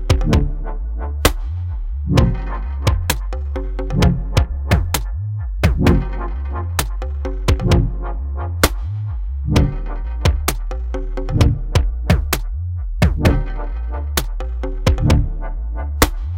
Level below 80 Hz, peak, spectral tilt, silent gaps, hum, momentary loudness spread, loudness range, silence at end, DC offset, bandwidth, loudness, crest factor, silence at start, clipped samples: -20 dBFS; 0 dBFS; -5.5 dB/octave; none; none; 10 LU; 2 LU; 0 s; under 0.1%; 17 kHz; -20 LUFS; 18 dB; 0 s; under 0.1%